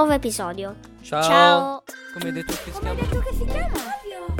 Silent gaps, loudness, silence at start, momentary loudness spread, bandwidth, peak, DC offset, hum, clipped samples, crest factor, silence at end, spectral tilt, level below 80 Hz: none; -22 LUFS; 0 s; 18 LU; 18 kHz; -2 dBFS; under 0.1%; none; under 0.1%; 20 dB; 0 s; -4.5 dB/octave; -32 dBFS